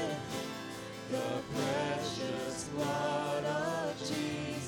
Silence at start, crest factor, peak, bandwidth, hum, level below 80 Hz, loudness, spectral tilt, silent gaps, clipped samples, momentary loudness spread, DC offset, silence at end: 0 s; 14 dB; -22 dBFS; over 20 kHz; none; -66 dBFS; -36 LUFS; -4.5 dB/octave; none; under 0.1%; 6 LU; under 0.1%; 0 s